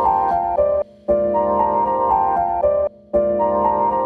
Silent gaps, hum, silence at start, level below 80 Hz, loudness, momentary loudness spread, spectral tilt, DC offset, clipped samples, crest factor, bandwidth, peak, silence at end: none; none; 0 s; -42 dBFS; -18 LUFS; 3 LU; -9.5 dB/octave; under 0.1%; under 0.1%; 12 dB; 3.4 kHz; -6 dBFS; 0 s